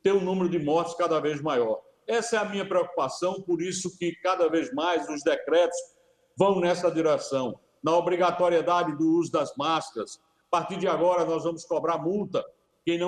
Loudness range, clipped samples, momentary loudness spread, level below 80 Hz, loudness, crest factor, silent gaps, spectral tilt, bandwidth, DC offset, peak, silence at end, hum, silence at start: 3 LU; under 0.1%; 7 LU; -70 dBFS; -26 LUFS; 18 dB; none; -5 dB/octave; 11 kHz; under 0.1%; -8 dBFS; 0 s; none; 0.05 s